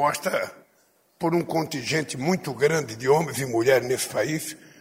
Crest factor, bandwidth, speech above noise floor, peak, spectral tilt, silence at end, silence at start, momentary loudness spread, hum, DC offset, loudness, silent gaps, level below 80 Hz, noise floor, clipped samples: 18 dB; 16 kHz; 39 dB; -6 dBFS; -4.5 dB/octave; 0.1 s; 0 s; 8 LU; none; under 0.1%; -24 LUFS; none; -64 dBFS; -63 dBFS; under 0.1%